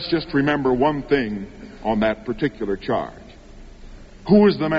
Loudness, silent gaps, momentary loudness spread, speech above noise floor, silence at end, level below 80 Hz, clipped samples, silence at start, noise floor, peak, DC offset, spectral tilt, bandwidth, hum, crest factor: -21 LUFS; none; 15 LU; 22 dB; 0 s; -42 dBFS; under 0.1%; 0 s; -41 dBFS; -4 dBFS; under 0.1%; -5 dB/octave; 7.4 kHz; none; 18 dB